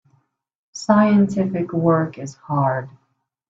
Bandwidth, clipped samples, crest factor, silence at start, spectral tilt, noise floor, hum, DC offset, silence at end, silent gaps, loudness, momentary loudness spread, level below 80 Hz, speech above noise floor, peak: 8 kHz; under 0.1%; 18 dB; 0.75 s; -7.5 dB/octave; -64 dBFS; none; under 0.1%; 0.6 s; none; -19 LUFS; 18 LU; -60 dBFS; 45 dB; -2 dBFS